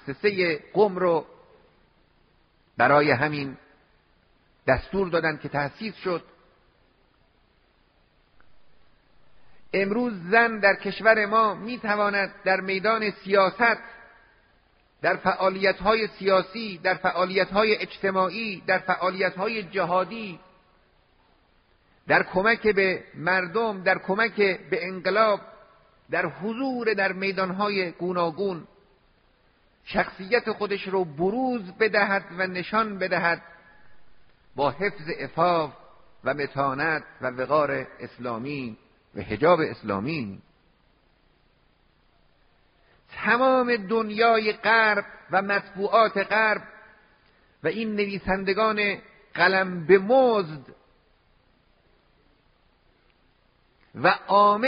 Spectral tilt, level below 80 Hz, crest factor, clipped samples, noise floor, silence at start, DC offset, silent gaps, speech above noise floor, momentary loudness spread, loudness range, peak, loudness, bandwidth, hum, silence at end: -3 dB/octave; -56 dBFS; 22 dB; under 0.1%; -63 dBFS; 0.05 s; under 0.1%; none; 40 dB; 11 LU; 6 LU; -4 dBFS; -24 LUFS; 5.4 kHz; none; 0 s